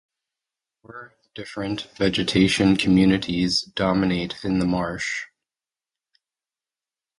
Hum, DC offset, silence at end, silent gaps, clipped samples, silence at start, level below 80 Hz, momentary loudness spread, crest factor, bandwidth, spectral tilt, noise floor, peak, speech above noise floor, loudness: none; under 0.1%; 1.95 s; none; under 0.1%; 0.9 s; -48 dBFS; 22 LU; 20 dB; 11.5 kHz; -5.5 dB/octave; under -90 dBFS; -4 dBFS; over 68 dB; -22 LUFS